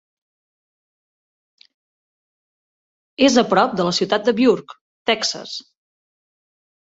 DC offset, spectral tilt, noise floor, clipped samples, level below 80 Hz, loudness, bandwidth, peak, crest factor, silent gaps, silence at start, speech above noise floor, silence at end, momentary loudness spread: under 0.1%; -4 dB/octave; under -90 dBFS; under 0.1%; -62 dBFS; -18 LUFS; 8 kHz; -2 dBFS; 20 dB; 4.81-5.05 s; 3.2 s; over 72 dB; 1.25 s; 15 LU